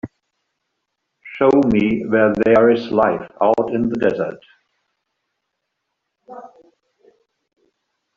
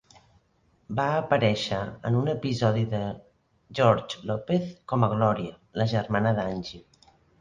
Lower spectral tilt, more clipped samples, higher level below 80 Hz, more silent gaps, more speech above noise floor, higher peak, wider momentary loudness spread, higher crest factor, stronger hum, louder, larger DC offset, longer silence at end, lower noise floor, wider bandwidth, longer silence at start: second, -5.5 dB/octave vs -7 dB/octave; neither; about the same, -52 dBFS vs -56 dBFS; neither; first, 61 dB vs 41 dB; first, -2 dBFS vs -6 dBFS; first, 23 LU vs 11 LU; about the same, 18 dB vs 20 dB; neither; first, -17 LUFS vs -27 LUFS; neither; first, 1.7 s vs 0.6 s; first, -76 dBFS vs -66 dBFS; about the same, 7.2 kHz vs 7.6 kHz; second, 0.05 s vs 0.9 s